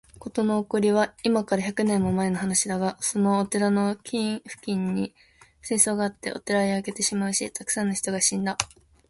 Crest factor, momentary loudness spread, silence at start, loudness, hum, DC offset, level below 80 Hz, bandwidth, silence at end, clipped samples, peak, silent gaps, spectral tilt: 24 dB; 8 LU; 0.15 s; -25 LUFS; none; under 0.1%; -58 dBFS; 12 kHz; 0.45 s; under 0.1%; -2 dBFS; none; -4 dB/octave